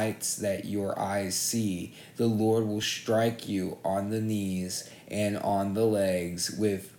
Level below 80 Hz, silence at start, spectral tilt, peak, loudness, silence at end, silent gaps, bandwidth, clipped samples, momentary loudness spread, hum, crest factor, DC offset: -66 dBFS; 0 s; -4.5 dB/octave; -14 dBFS; -29 LUFS; 0 s; none; 19 kHz; under 0.1%; 7 LU; none; 14 dB; under 0.1%